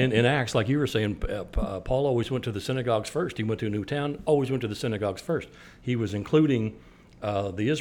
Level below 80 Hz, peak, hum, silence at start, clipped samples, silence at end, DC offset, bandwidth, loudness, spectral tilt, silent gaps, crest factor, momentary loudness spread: -42 dBFS; -8 dBFS; none; 0 s; under 0.1%; 0 s; under 0.1%; 17 kHz; -27 LUFS; -6.5 dB/octave; none; 18 dB; 9 LU